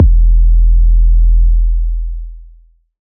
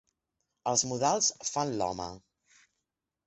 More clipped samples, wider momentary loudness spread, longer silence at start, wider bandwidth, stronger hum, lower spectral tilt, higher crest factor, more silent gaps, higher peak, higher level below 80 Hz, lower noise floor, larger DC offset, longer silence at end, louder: neither; about the same, 13 LU vs 12 LU; second, 0 s vs 0.65 s; second, 0.3 kHz vs 8.6 kHz; neither; first, -19 dB/octave vs -2.5 dB/octave; second, 8 dB vs 22 dB; neither; first, 0 dBFS vs -12 dBFS; first, -10 dBFS vs -64 dBFS; second, -44 dBFS vs -86 dBFS; neither; second, 0.65 s vs 1.1 s; first, -13 LUFS vs -30 LUFS